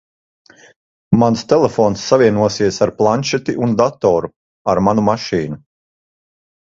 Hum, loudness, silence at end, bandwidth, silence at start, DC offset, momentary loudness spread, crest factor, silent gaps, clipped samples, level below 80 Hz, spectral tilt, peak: none; -15 LUFS; 1.1 s; 7.8 kHz; 1.1 s; under 0.1%; 8 LU; 16 dB; 4.36-4.65 s; under 0.1%; -48 dBFS; -6 dB/octave; 0 dBFS